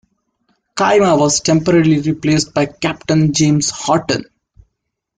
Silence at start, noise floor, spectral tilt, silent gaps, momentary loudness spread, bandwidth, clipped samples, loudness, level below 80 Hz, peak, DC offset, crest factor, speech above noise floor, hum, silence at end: 0.75 s; -74 dBFS; -5 dB/octave; none; 7 LU; 9.6 kHz; under 0.1%; -14 LUFS; -48 dBFS; -2 dBFS; under 0.1%; 14 dB; 61 dB; none; 0.95 s